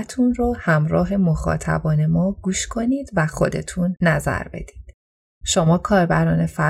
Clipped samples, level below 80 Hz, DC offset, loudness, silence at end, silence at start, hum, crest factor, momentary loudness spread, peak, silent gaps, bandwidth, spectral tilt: under 0.1%; -36 dBFS; under 0.1%; -20 LUFS; 0 s; 0 s; none; 16 dB; 7 LU; -4 dBFS; 4.94-5.41 s; 13 kHz; -6 dB/octave